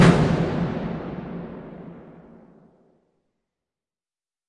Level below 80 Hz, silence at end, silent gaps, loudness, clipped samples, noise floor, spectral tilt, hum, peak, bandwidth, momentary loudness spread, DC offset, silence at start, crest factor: -44 dBFS; 2.4 s; none; -24 LUFS; under 0.1%; under -90 dBFS; -7 dB/octave; none; -2 dBFS; 11 kHz; 22 LU; under 0.1%; 0 s; 22 dB